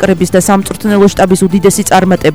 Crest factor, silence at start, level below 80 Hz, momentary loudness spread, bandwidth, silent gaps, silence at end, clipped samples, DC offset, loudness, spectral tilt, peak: 8 dB; 0 s; -34 dBFS; 3 LU; over 20 kHz; none; 0 s; 0.8%; under 0.1%; -9 LUFS; -5 dB/octave; 0 dBFS